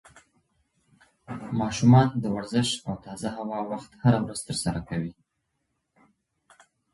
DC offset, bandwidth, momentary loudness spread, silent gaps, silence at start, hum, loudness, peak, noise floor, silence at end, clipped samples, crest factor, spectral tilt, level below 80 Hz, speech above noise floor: under 0.1%; 11.5 kHz; 16 LU; none; 1.3 s; none; -26 LUFS; -6 dBFS; -78 dBFS; 1.8 s; under 0.1%; 22 dB; -6 dB/octave; -54 dBFS; 53 dB